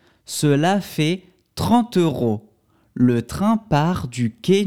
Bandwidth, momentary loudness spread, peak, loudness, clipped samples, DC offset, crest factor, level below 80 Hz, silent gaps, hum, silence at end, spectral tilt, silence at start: 17 kHz; 11 LU; -4 dBFS; -20 LUFS; under 0.1%; 0.2%; 16 dB; -46 dBFS; none; none; 0 s; -6 dB/octave; 0.3 s